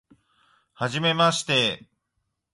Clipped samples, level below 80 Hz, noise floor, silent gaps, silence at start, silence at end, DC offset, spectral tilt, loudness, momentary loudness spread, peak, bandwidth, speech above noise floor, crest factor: under 0.1%; -64 dBFS; -78 dBFS; none; 0.8 s; 0.75 s; under 0.1%; -3.5 dB/octave; -22 LUFS; 11 LU; -6 dBFS; 11.5 kHz; 55 dB; 20 dB